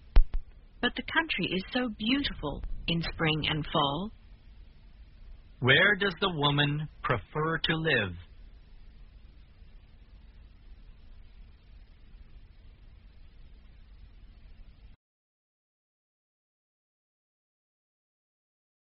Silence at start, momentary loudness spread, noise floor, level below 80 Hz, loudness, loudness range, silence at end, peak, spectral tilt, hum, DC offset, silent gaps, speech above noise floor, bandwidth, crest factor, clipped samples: 0.05 s; 13 LU; -53 dBFS; -38 dBFS; -28 LUFS; 7 LU; 4.05 s; -6 dBFS; -3 dB/octave; none; under 0.1%; none; 24 dB; 5.6 kHz; 26 dB; under 0.1%